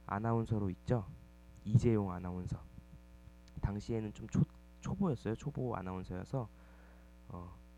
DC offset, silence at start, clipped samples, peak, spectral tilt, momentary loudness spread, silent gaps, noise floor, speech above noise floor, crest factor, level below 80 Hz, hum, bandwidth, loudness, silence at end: under 0.1%; 0 s; under 0.1%; -16 dBFS; -8.5 dB/octave; 18 LU; none; -58 dBFS; 21 dB; 22 dB; -54 dBFS; none; 9.2 kHz; -38 LUFS; 0 s